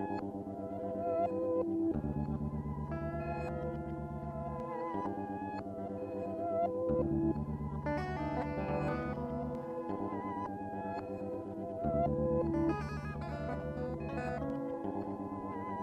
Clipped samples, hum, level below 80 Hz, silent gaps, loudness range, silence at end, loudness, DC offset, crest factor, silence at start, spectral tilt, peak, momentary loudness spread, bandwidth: under 0.1%; none; -50 dBFS; none; 4 LU; 0 s; -37 LUFS; under 0.1%; 16 dB; 0 s; -9.5 dB/octave; -20 dBFS; 8 LU; 9 kHz